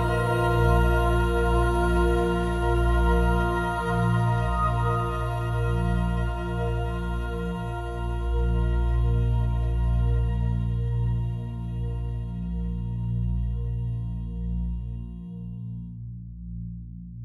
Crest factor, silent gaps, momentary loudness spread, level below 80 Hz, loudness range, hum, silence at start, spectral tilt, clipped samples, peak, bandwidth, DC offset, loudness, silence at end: 14 dB; none; 14 LU; -28 dBFS; 8 LU; 60 Hz at -45 dBFS; 0 s; -8 dB/octave; under 0.1%; -10 dBFS; 12 kHz; under 0.1%; -26 LUFS; 0 s